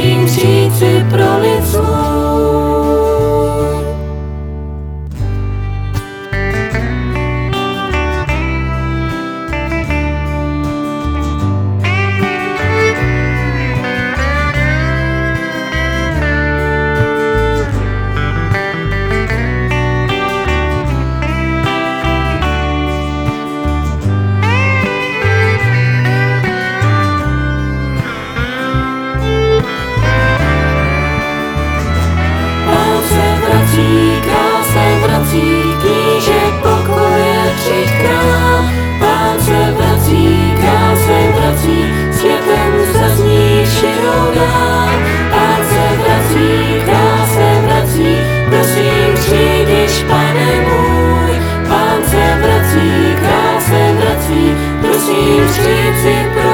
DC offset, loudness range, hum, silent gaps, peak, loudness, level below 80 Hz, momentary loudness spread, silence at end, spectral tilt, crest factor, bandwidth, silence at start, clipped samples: under 0.1%; 6 LU; none; none; 0 dBFS; -12 LUFS; -24 dBFS; 7 LU; 0 s; -5.5 dB/octave; 12 dB; over 20 kHz; 0 s; under 0.1%